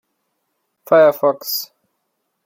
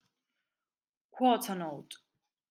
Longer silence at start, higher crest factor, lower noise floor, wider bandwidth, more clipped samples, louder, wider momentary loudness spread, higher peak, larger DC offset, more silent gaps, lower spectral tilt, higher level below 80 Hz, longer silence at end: second, 0.9 s vs 1.15 s; about the same, 18 dB vs 22 dB; second, -72 dBFS vs under -90 dBFS; about the same, 16.5 kHz vs 16.5 kHz; neither; first, -16 LUFS vs -31 LUFS; second, 12 LU vs 22 LU; first, -2 dBFS vs -14 dBFS; neither; neither; about the same, -3.5 dB/octave vs -4.5 dB/octave; first, -72 dBFS vs -90 dBFS; first, 0.8 s vs 0.55 s